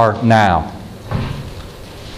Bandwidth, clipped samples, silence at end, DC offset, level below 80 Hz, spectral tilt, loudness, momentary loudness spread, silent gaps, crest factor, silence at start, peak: 14.5 kHz; under 0.1%; 0 s; under 0.1%; -34 dBFS; -6.5 dB/octave; -16 LUFS; 21 LU; none; 16 dB; 0 s; 0 dBFS